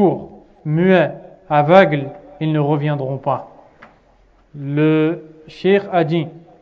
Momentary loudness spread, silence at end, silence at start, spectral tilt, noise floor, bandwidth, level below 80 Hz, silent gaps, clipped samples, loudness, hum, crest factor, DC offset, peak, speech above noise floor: 18 LU; 0.2 s; 0 s; -9 dB/octave; -53 dBFS; 6.6 kHz; -56 dBFS; none; under 0.1%; -17 LUFS; none; 18 dB; under 0.1%; 0 dBFS; 37 dB